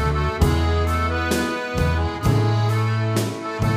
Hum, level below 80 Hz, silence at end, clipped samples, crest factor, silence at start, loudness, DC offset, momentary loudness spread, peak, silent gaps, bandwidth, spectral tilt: none; -28 dBFS; 0 s; under 0.1%; 16 dB; 0 s; -21 LUFS; under 0.1%; 4 LU; -4 dBFS; none; 15.5 kHz; -6 dB/octave